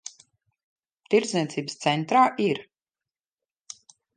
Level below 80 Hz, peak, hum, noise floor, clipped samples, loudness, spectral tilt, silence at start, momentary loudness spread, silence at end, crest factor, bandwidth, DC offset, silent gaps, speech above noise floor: -76 dBFS; -6 dBFS; none; under -90 dBFS; under 0.1%; -24 LUFS; -4.5 dB/octave; 0.05 s; 23 LU; 1.55 s; 20 dB; 10 kHz; under 0.1%; 0.64-0.76 s; over 67 dB